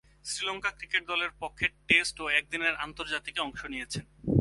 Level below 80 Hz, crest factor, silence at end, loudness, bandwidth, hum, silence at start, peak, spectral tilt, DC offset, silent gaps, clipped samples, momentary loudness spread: -54 dBFS; 24 dB; 0 s; -30 LUFS; 11.5 kHz; none; 0.25 s; -8 dBFS; -3.5 dB/octave; under 0.1%; none; under 0.1%; 12 LU